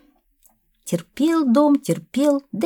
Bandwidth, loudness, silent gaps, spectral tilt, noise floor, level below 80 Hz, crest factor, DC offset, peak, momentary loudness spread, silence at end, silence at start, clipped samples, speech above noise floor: 18.5 kHz; -20 LUFS; none; -6 dB/octave; -60 dBFS; -66 dBFS; 16 dB; under 0.1%; -4 dBFS; 11 LU; 0 s; 0.85 s; under 0.1%; 41 dB